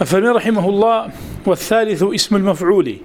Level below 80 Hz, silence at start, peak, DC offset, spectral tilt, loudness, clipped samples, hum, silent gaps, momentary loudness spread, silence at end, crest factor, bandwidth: -44 dBFS; 0 s; 0 dBFS; under 0.1%; -5 dB/octave; -15 LUFS; under 0.1%; none; none; 6 LU; 0 s; 16 dB; 18.5 kHz